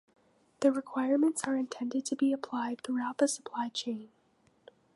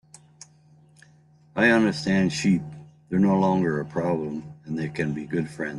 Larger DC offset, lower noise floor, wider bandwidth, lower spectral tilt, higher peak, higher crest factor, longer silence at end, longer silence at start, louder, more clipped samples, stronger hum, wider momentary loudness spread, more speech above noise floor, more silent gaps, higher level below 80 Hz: neither; first, -69 dBFS vs -56 dBFS; about the same, 11.5 kHz vs 11.5 kHz; second, -3 dB/octave vs -6.5 dB/octave; second, -14 dBFS vs -6 dBFS; about the same, 20 dB vs 18 dB; first, 0.9 s vs 0 s; second, 0.6 s vs 1.55 s; second, -32 LUFS vs -24 LUFS; neither; neither; second, 7 LU vs 13 LU; first, 38 dB vs 33 dB; neither; second, -82 dBFS vs -60 dBFS